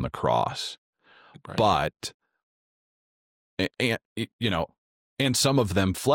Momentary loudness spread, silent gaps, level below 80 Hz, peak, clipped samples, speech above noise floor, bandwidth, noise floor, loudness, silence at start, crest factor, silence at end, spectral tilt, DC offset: 16 LU; 0.78-0.93 s, 2.14-2.20 s, 2.43-3.57 s, 4.05-4.16 s, 4.33-4.39 s, 4.78-5.17 s; -54 dBFS; -10 dBFS; under 0.1%; over 64 dB; 17 kHz; under -90 dBFS; -26 LUFS; 0 s; 18 dB; 0 s; -4.5 dB/octave; under 0.1%